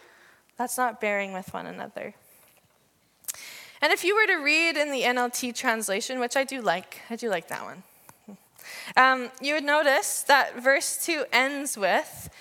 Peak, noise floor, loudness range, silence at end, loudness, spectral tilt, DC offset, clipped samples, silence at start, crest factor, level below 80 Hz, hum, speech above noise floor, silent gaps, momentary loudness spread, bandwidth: -2 dBFS; -65 dBFS; 9 LU; 0 s; -24 LUFS; -1.5 dB/octave; under 0.1%; under 0.1%; 0.6 s; 24 dB; -72 dBFS; none; 40 dB; none; 17 LU; 17.5 kHz